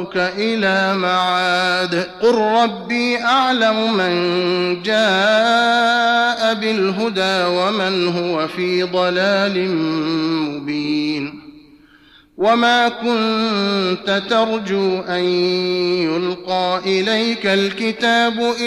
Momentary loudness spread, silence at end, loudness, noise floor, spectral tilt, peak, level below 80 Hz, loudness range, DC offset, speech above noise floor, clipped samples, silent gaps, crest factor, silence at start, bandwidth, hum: 6 LU; 0 s; -17 LUFS; -49 dBFS; -4.5 dB/octave; -6 dBFS; -60 dBFS; 4 LU; under 0.1%; 32 dB; under 0.1%; none; 12 dB; 0 s; 12.5 kHz; none